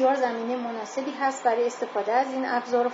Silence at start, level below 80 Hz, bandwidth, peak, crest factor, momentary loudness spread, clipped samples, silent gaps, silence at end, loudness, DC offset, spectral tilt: 0 s; -88 dBFS; 7.8 kHz; -10 dBFS; 14 dB; 7 LU; under 0.1%; none; 0 s; -26 LUFS; under 0.1%; -3.5 dB/octave